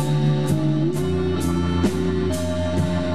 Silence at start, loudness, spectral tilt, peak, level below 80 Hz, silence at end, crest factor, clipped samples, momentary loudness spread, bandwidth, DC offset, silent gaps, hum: 0 s; -22 LUFS; -7 dB/octave; -8 dBFS; -38 dBFS; 0 s; 12 dB; under 0.1%; 3 LU; 14 kHz; 2%; none; none